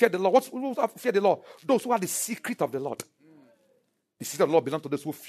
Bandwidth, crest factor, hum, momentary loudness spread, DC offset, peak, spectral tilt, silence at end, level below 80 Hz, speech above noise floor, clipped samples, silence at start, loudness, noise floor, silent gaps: 13.5 kHz; 22 dB; none; 12 LU; under 0.1%; -4 dBFS; -4 dB/octave; 0 s; -80 dBFS; 44 dB; under 0.1%; 0 s; -27 LUFS; -70 dBFS; none